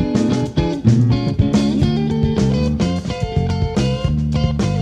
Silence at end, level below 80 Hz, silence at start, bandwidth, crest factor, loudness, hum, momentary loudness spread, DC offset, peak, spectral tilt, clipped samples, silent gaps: 0 s; -28 dBFS; 0 s; 10 kHz; 16 dB; -17 LUFS; none; 4 LU; under 0.1%; 0 dBFS; -7.5 dB/octave; under 0.1%; none